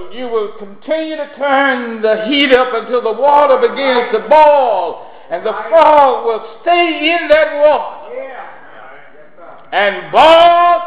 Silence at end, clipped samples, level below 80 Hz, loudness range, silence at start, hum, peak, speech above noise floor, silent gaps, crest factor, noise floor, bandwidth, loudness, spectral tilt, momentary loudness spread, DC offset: 0 s; under 0.1%; -50 dBFS; 4 LU; 0 s; none; 0 dBFS; 28 dB; none; 12 dB; -39 dBFS; 9.2 kHz; -11 LUFS; -4.5 dB/octave; 17 LU; 1%